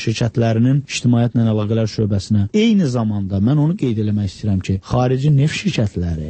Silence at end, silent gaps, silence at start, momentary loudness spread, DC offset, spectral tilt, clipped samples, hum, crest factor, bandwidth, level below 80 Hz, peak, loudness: 0 s; none; 0 s; 5 LU; under 0.1%; -7 dB/octave; under 0.1%; none; 12 dB; 8.8 kHz; -40 dBFS; -4 dBFS; -17 LUFS